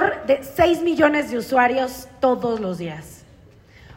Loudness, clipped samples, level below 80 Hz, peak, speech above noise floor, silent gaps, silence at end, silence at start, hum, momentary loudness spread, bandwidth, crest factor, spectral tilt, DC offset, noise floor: -20 LUFS; under 0.1%; -50 dBFS; -4 dBFS; 29 dB; none; 0.05 s; 0 s; none; 11 LU; 16.5 kHz; 18 dB; -5.5 dB/octave; under 0.1%; -49 dBFS